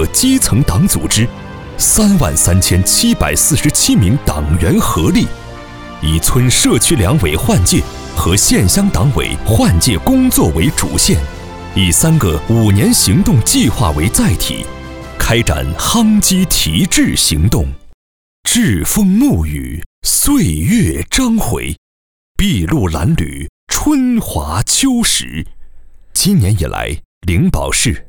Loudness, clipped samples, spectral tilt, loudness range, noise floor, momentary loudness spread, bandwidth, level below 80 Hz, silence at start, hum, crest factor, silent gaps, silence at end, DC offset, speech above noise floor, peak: -12 LUFS; under 0.1%; -4 dB/octave; 4 LU; -33 dBFS; 11 LU; over 20 kHz; -24 dBFS; 0 s; none; 12 dB; 17.94-18.43 s, 19.86-20.02 s, 21.78-22.35 s, 23.49-23.67 s, 27.05-27.21 s; 0.05 s; under 0.1%; 22 dB; 0 dBFS